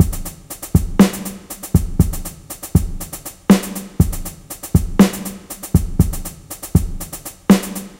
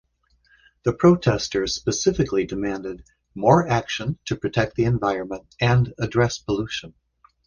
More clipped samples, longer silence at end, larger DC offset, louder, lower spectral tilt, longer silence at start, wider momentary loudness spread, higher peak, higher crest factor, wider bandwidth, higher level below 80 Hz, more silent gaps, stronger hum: neither; second, 0.05 s vs 0.55 s; neither; first, -18 LUFS vs -22 LUFS; about the same, -6 dB/octave vs -5.5 dB/octave; second, 0 s vs 0.85 s; first, 16 LU vs 12 LU; about the same, 0 dBFS vs -2 dBFS; about the same, 18 dB vs 20 dB; first, 16.5 kHz vs 9.8 kHz; first, -26 dBFS vs -46 dBFS; neither; neither